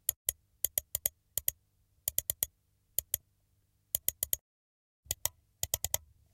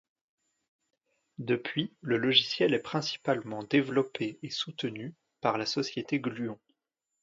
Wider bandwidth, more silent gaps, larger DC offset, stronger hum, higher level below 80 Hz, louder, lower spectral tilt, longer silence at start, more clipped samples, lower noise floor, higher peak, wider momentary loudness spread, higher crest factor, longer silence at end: first, 17 kHz vs 7.8 kHz; first, 0.16-0.25 s, 4.41-5.03 s vs none; neither; first, 50 Hz at -75 dBFS vs none; first, -60 dBFS vs -74 dBFS; second, -35 LUFS vs -30 LUFS; second, 0 dB/octave vs -5 dB/octave; second, 0.1 s vs 1.4 s; neither; second, -74 dBFS vs -84 dBFS; about the same, -8 dBFS vs -8 dBFS; second, 5 LU vs 14 LU; first, 32 dB vs 24 dB; second, 0.35 s vs 0.7 s